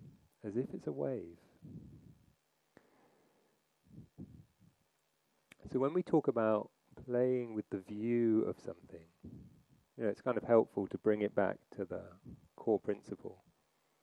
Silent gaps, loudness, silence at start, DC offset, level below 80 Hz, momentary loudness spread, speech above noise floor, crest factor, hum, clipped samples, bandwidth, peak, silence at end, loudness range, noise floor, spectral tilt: none; -36 LUFS; 0 s; under 0.1%; -74 dBFS; 23 LU; 43 dB; 22 dB; none; under 0.1%; 10 kHz; -16 dBFS; 0.7 s; 10 LU; -79 dBFS; -9 dB/octave